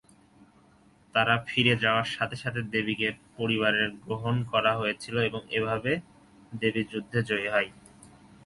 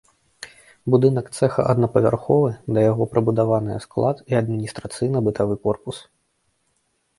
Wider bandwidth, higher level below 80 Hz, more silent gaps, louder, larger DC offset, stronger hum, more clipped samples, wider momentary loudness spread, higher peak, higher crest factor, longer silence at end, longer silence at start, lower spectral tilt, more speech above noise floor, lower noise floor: about the same, 11.5 kHz vs 11.5 kHz; second, -60 dBFS vs -52 dBFS; neither; second, -27 LUFS vs -21 LUFS; neither; neither; neither; second, 7 LU vs 15 LU; second, -8 dBFS vs -2 dBFS; about the same, 22 dB vs 20 dB; second, 0.4 s vs 1.2 s; about the same, 0.4 s vs 0.4 s; second, -5.5 dB/octave vs -8 dB/octave; second, 32 dB vs 49 dB; second, -60 dBFS vs -69 dBFS